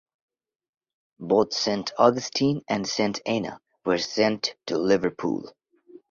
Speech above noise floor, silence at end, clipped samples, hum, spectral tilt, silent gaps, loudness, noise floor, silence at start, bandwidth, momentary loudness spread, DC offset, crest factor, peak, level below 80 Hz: 28 dB; 0.15 s; under 0.1%; none; -4.5 dB/octave; none; -25 LUFS; -52 dBFS; 1.2 s; 7.6 kHz; 9 LU; under 0.1%; 22 dB; -4 dBFS; -64 dBFS